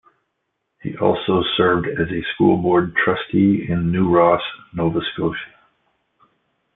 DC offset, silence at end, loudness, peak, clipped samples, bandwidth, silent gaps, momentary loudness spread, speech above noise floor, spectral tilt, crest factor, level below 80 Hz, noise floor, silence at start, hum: under 0.1%; 1.3 s; -18 LUFS; -2 dBFS; under 0.1%; 4 kHz; none; 10 LU; 56 dB; -11 dB/octave; 18 dB; -50 dBFS; -74 dBFS; 0.85 s; none